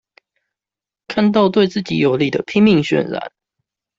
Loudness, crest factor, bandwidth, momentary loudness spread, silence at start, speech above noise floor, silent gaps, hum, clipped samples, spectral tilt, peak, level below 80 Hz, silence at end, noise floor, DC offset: -16 LUFS; 16 dB; 7.6 kHz; 11 LU; 1.1 s; 74 dB; none; none; under 0.1%; -7 dB/octave; -2 dBFS; -56 dBFS; 0.7 s; -89 dBFS; under 0.1%